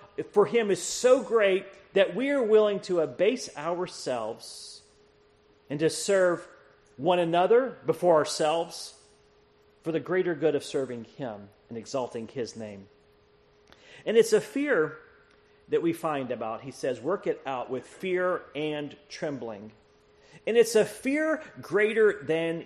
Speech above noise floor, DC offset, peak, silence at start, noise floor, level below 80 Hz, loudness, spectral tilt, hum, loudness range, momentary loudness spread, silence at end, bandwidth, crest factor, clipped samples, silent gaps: 35 dB; under 0.1%; -8 dBFS; 0 s; -61 dBFS; -70 dBFS; -27 LUFS; -4.5 dB/octave; none; 7 LU; 15 LU; 0 s; 13 kHz; 18 dB; under 0.1%; none